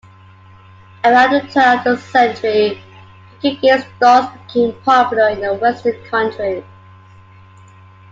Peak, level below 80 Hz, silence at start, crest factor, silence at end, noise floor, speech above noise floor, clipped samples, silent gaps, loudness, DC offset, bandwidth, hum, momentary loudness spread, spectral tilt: 0 dBFS; -58 dBFS; 1.05 s; 16 dB; 1.5 s; -42 dBFS; 28 dB; under 0.1%; none; -14 LUFS; under 0.1%; 7.6 kHz; none; 10 LU; -5 dB/octave